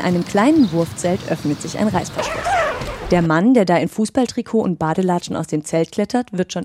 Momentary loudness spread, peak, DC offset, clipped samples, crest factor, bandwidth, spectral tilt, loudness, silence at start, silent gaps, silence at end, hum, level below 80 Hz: 8 LU; -2 dBFS; under 0.1%; under 0.1%; 16 dB; 15.5 kHz; -6 dB/octave; -18 LUFS; 0 s; none; 0 s; none; -42 dBFS